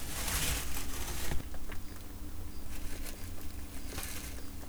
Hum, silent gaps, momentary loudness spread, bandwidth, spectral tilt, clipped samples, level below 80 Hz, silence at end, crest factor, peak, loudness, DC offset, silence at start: none; none; 13 LU; over 20 kHz; -3 dB/octave; under 0.1%; -42 dBFS; 0 s; 14 dB; -20 dBFS; -40 LUFS; under 0.1%; 0 s